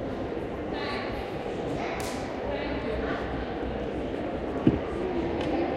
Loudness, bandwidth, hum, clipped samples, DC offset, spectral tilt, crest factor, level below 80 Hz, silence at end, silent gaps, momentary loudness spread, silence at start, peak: -31 LUFS; 16 kHz; none; under 0.1%; under 0.1%; -6.5 dB/octave; 24 dB; -42 dBFS; 0 s; none; 7 LU; 0 s; -8 dBFS